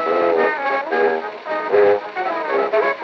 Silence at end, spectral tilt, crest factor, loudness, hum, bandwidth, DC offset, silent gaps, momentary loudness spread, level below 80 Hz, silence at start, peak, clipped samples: 0 s; -5.5 dB/octave; 14 dB; -19 LUFS; none; 6.2 kHz; under 0.1%; none; 8 LU; -76 dBFS; 0 s; -4 dBFS; under 0.1%